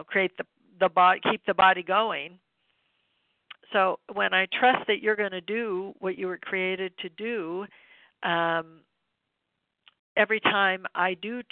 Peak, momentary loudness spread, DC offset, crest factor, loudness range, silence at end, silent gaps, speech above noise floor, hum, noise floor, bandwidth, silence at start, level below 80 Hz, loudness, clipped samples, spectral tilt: -8 dBFS; 13 LU; under 0.1%; 20 dB; 6 LU; 0.1 s; 9.99-10.16 s; 55 dB; none; -81 dBFS; 4.5 kHz; 0 s; -72 dBFS; -26 LUFS; under 0.1%; -8 dB/octave